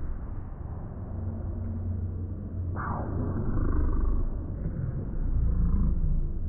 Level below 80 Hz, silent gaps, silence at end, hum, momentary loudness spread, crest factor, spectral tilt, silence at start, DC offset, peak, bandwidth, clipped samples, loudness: -30 dBFS; none; 0 s; none; 10 LU; 14 dB; -14 dB/octave; 0 s; under 0.1%; -14 dBFS; 2 kHz; under 0.1%; -32 LUFS